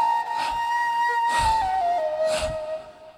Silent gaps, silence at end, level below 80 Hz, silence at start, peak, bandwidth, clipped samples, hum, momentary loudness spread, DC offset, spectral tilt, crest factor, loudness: none; 0.05 s; -44 dBFS; 0 s; -12 dBFS; 15.5 kHz; under 0.1%; none; 8 LU; under 0.1%; -2.5 dB/octave; 12 dB; -24 LUFS